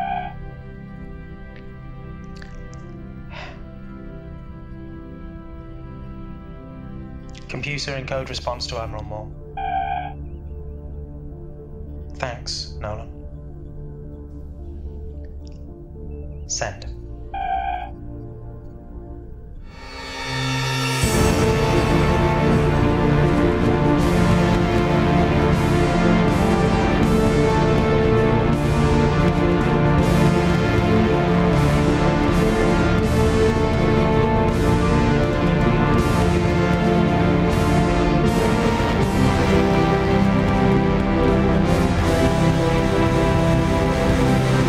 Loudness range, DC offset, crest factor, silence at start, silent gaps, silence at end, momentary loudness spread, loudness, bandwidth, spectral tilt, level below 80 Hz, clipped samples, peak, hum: 19 LU; under 0.1%; 16 dB; 0 s; none; 0 s; 20 LU; -19 LUFS; 15.5 kHz; -6.5 dB/octave; -28 dBFS; under 0.1%; -4 dBFS; none